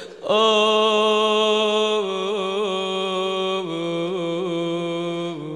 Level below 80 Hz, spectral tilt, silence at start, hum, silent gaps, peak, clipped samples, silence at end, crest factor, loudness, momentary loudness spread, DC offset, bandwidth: -74 dBFS; -4 dB/octave; 0 s; none; none; -6 dBFS; under 0.1%; 0 s; 14 dB; -21 LUFS; 8 LU; under 0.1%; 11 kHz